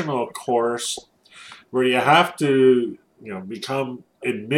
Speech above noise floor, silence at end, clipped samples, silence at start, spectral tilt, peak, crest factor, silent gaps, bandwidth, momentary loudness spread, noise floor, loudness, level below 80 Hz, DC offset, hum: 25 dB; 0 s; under 0.1%; 0 s; -4.5 dB/octave; -2 dBFS; 20 dB; none; 15.5 kHz; 19 LU; -45 dBFS; -21 LUFS; -70 dBFS; under 0.1%; none